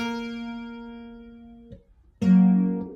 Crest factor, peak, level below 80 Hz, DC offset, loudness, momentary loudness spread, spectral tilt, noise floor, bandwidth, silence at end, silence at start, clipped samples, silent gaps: 16 dB; -10 dBFS; -56 dBFS; under 0.1%; -22 LUFS; 25 LU; -8.5 dB/octave; -50 dBFS; 6.4 kHz; 0 s; 0 s; under 0.1%; none